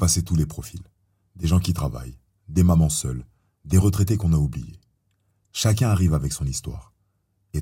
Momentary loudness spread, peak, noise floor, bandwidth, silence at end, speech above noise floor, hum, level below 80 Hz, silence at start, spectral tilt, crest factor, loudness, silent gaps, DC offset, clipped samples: 18 LU; -6 dBFS; -69 dBFS; 16.5 kHz; 0 s; 48 dB; none; -38 dBFS; 0 s; -5.5 dB/octave; 16 dB; -22 LUFS; none; under 0.1%; under 0.1%